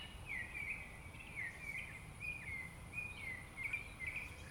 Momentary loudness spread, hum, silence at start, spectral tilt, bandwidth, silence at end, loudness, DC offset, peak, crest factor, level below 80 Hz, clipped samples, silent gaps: 4 LU; none; 0 s; -3.5 dB/octave; 19.5 kHz; 0 s; -45 LUFS; under 0.1%; -32 dBFS; 16 dB; -60 dBFS; under 0.1%; none